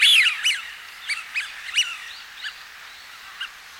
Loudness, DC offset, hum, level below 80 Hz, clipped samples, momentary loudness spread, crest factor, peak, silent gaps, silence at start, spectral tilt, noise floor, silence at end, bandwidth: -21 LUFS; under 0.1%; none; -68 dBFS; under 0.1%; 22 LU; 20 dB; -6 dBFS; none; 0 s; 5 dB/octave; -42 dBFS; 0 s; over 20 kHz